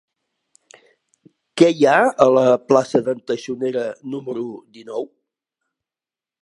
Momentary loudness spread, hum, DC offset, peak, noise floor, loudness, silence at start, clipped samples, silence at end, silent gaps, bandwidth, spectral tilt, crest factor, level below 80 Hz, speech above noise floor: 17 LU; none; under 0.1%; 0 dBFS; under -90 dBFS; -18 LUFS; 1.55 s; under 0.1%; 1.35 s; none; 11.5 kHz; -5.5 dB/octave; 20 dB; -66 dBFS; over 72 dB